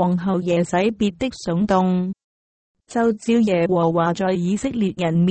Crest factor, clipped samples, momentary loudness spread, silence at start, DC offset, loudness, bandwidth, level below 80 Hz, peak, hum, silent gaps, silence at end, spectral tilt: 14 dB; under 0.1%; 5 LU; 0 s; under 0.1%; -20 LUFS; 8.8 kHz; -50 dBFS; -4 dBFS; none; 2.24-2.75 s; 0 s; -7 dB/octave